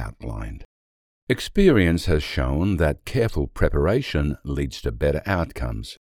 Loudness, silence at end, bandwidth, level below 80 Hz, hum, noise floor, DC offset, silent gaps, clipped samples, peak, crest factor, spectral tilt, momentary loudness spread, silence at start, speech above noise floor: -23 LUFS; 0.15 s; 16.5 kHz; -32 dBFS; none; under -90 dBFS; under 0.1%; 0.65-1.27 s; under 0.1%; -4 dBFS; 20 dB; -6.5 dB/octave; 14 LU; 0 s; over 68 dB